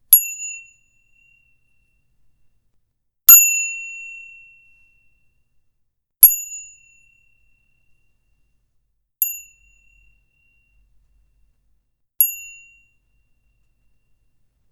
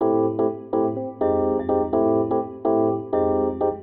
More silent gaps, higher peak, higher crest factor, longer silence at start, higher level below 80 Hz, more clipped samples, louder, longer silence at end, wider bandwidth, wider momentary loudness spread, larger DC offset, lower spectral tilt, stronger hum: neither; first, 0 dBFS vs -8 dBFS; first, 22 dB vs 12 dB; about the same, 0.1 s vs 0 s; second, -58 dBFS vs -52 dBFS; neither; first, -12 LUFS vs -22 LUFS; first, 2.3 s vs 0 s; first, over 20 kHz vs 3.7 kHz; first, 27 LU vs 4 LU; neither; second, 4 dB/octave vs -12.5 dB/octave; neither